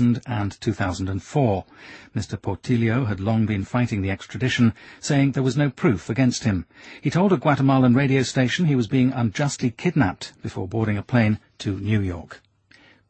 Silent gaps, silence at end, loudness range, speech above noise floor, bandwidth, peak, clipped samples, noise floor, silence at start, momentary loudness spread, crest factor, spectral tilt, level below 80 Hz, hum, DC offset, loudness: none; 0.75 s; 4 LU; 33 dB; 8.8 kHz; -6 dBFS; under 0.1%; -55 dBFS; 0 s; 11 LU; 16 dB; -6.5 dB/octave; -50 dBFS; none; under 0.1%; -22 LUFS